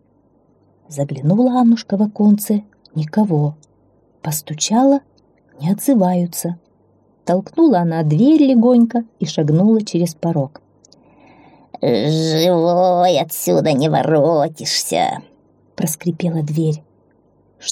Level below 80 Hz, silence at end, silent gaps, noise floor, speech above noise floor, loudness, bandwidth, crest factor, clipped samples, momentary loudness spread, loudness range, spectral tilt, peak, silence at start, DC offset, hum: -64 dBFS; 0 s; none; -56 dBFS; 41 dB; -16 LUFS; 16.5 kHz; 14 dB; under 0.1%; 11 LU; 5 LU; -6 dB/octave; -4 dBFS; 0.9 s; under 0.1%; none